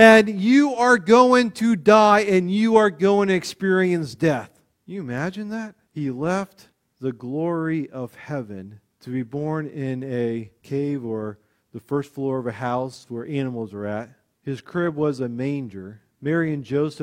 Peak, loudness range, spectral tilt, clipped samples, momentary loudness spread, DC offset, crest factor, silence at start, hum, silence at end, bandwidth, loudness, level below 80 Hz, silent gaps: 0 dBFS; 12 LU; -6 dB/octave; under 0.1%; 18 LU; under 0.1%; 20 dB; 0 s; none; 0 s; 15 kHz; -21 LUFS; -62 dBFS; none